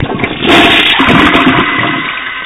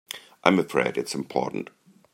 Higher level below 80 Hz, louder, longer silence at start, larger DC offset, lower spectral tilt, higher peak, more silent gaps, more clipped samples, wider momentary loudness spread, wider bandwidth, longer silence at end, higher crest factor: first, -32 dBFS vs -68 dBFS; first, -7 LUFS vs -25 LUFS; second, 0 s vs 0.15 s; neither; about the same, -5 dB/octave vs -5 dB/octave; about the same, 0 dBFS vs -2 dBFS; neither; first, 1% vs under 0.1%; second, 10 LU vs 15 LU; about the same, 16.5 kHz vs 16 kHz; second, 0 s vs 0.5 s; second, 8 dB vs 26 dB